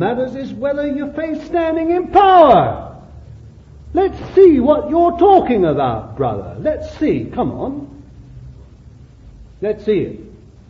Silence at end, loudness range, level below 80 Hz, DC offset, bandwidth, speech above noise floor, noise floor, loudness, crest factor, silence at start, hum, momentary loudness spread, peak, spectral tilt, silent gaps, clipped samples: 0.35 s; 11 LU; -40 dBFS; under 0.1%; 6.6 kHz; 27 dB; -41 dBFS; -15 LUFS; 16 dB; 0 s; none; 16 LU; 0 dBFS; -8.5 dB/octave; none; under 0.1%